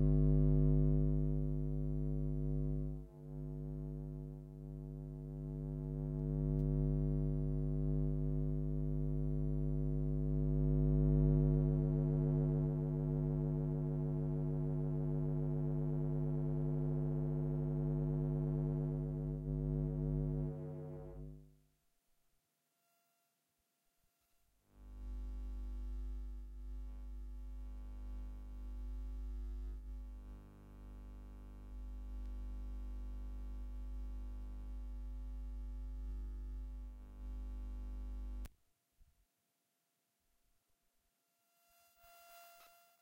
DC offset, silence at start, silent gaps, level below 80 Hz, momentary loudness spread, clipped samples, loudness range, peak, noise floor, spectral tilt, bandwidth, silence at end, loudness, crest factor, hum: under 0.1%; 0 s; none; -44 dBFS; 18 LU; under 0.1%; 17 LU; -20 dBFS; -84 dBFS; -11.5 dB/octave; 2.7 kHz; 0.35 s; -39 LUFS; 18 dB; none